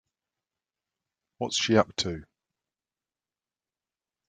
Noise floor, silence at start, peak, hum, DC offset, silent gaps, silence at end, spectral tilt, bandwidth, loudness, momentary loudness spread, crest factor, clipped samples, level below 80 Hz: under -90 dBFS; 1.4 s; -6 dBFS; none; under 0.1%; none; 2.05 s; -4 dB/octave; 9.6 kHz; -27 LUFS; 13 LU; 26 dB; under 0.1%; -64 dBFS